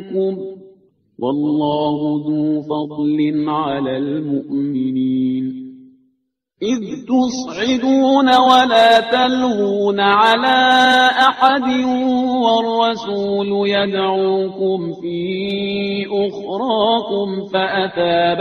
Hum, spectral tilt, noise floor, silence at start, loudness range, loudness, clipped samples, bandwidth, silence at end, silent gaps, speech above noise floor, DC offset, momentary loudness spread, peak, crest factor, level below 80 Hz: none; -5 dB/octave; -69 dBFS; 0 s; 8 LU; -16 LUFS; under 0.1%; 11 kHz; 0 s; none; 53 dB; under 0.1%; 11 LU; 0 dBFS; 16 dB; -58 dBFS